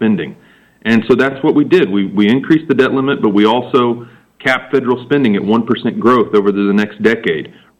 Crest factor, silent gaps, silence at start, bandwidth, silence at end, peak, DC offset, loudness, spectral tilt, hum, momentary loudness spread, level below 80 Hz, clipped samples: 12 dB; none; 0 s; 9.2 kHz; 0.3 s; -2 dBFS; under 0.1%; -13 LUFS; -7.5 dB/octave; none; 6 LU; -56 dBFS; under 0.1%